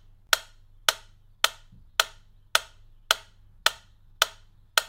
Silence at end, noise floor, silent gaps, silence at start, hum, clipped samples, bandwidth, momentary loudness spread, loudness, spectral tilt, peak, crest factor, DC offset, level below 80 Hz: 0.05 s; -51 dBFS; none; 0.3 s; none; under 0.1%; 16.5 kHz; 1 LU; -27 LUFS; 2 dB/octave; 0 dBFS; 30 dB; under 0.1%; -54 dBFS